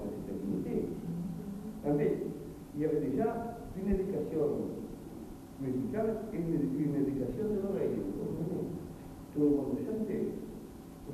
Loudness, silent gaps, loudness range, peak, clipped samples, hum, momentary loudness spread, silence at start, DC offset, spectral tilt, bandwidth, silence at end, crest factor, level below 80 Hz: -35 LUFS; none; 2 LU; -18 dBFS; under 0.1%; none; 13 LU; 0 s; under 0.1%; -9 dB/octave; 14 kHz; 0 s; 16 dB; -52 dBFS